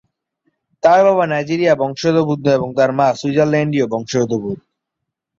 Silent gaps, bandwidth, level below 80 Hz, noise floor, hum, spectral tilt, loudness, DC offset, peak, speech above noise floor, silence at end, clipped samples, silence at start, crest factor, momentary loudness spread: none; 7.6 kHz; -56 dBFS; -79 dBFS; none; -6.5 dB/octave; -16 LUFS; under 0.1%; -2 dBFS; 64 dB; 0.85 s; under 0.1%; 0.85 s; 14 dB; 7 LU